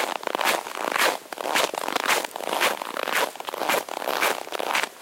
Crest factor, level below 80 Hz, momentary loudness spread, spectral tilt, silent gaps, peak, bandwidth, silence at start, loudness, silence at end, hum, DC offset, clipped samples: 20 dB; -76 dBFS; 6 LU; -0.5 dB/octave; none; -6 dBFS; 17 kHz; 0 s; -25 LUFS; 0 s; none; under 0.1%; under 0.1%